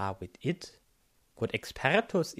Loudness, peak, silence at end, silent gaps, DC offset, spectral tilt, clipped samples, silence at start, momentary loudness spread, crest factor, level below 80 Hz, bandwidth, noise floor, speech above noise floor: -32 LUFS; -10 dBFS; 0.05 s; none; under 0.1%; -5 dB/octave; under 0.1%; 0 s; 12 LU; 24 dB; -60 dBFS; 15.5 kHz; -69 dBFS; 37 dB